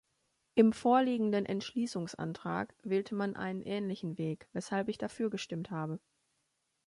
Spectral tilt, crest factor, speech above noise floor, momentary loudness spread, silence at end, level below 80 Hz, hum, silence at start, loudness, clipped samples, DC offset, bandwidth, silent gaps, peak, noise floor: -6.5 dB/octave; 22 dB; 47 dB; 11 LU; 0.9 s; -72 dBFS; none; 0.55 s; -34 LUFS; under 0.1%; under 0.1%; 11.5 kHz; none; -12 dBFS; -81 dBFS